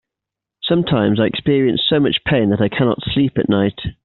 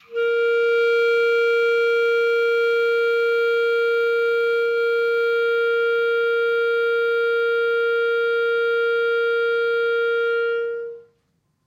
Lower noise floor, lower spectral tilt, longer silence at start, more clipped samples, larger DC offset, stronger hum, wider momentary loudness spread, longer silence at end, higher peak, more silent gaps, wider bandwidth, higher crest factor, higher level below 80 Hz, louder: first, -85 dBFS vs -68 dBFS; first, -5 dB/octave vs -1.5 dB/octave; first, 0.65 s vs 0.1 s; neither; neither; neither; about the same, 3 LU vs 2 LU; second, 0.15 s vs 0.65 s; first, -2 dBFS vs -12 dBFS; neither; second, 4.3 kHz vs 13 kHz; first, 14 dB vs 8 dB; first, -44 dBFS vs -82 dBFS; first, -16 LUFS vs -20 LUFS